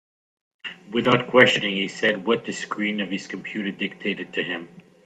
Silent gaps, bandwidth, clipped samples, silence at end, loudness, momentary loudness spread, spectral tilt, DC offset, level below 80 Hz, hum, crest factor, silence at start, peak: none; 9.4 kHz; under 0.1%; 0.25 s; -23 LUFS; 15 LU; -4.5 dB/octave; under 0.1%; -66 dBFS; none; 24 dB; 0.65 s; 0 dBFS